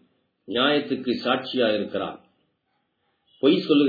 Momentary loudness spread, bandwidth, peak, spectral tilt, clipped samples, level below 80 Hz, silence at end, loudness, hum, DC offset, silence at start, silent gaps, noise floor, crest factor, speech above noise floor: 8 LU; 4.9 kHz; -6 dBFS; -7 dB/octave; under 0.1%; -70 dBFS; 0 s; -24 LUFS; none; under 0.1%; 0.5 s; none; -73 dBFS; 18 dB; 51 dB